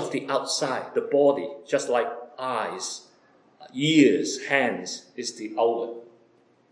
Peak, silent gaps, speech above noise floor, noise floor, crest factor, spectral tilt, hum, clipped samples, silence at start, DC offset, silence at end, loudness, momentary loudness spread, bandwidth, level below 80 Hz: -6 dBFS; none; 36 dB; -61 dBFS; 20 dB; -4 dB/octave; none; under 0.1%; 0 s; under 0.1%; 0.65 s; -25 LUFS; 14 LU; 10.5 kHz; -84 dBFS